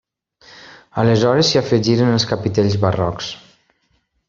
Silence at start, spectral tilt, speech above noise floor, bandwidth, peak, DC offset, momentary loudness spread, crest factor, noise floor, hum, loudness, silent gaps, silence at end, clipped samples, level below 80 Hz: 0.55 s; -5.5 dB/octave; 49 dB; 7.6 kHz; -2 dBFS; under 0.1%; 14 LU; 16 dB; -65 dBFS; none; -16 LUFS; none; 0.9 s; under 0.1%; -50 dBFS